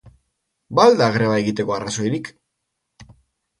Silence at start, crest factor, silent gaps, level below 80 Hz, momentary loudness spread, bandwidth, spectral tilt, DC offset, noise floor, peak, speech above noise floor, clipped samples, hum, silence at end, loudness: 0.05 s; 20 dB; none; -56 dBFS; 11 LU; 11.5 kHz; -5.5 dB/octave; under 0.1%; -77 dBFS; 0 dBFS; 59 dB; under 0.1%; none; 0.55 s; -18 LUFS